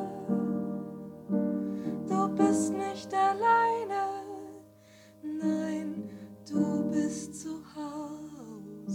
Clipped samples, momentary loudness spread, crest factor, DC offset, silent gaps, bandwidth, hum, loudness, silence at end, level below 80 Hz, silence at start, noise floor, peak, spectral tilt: under 0.1%; 18 LU; 18 dB; under 0.1%; none; 15.5 kHz; none; -31 LUFS; 0 s; -72 dBFS; 0 s; -56 dBFS; -12 dBFS; -6 dB/octave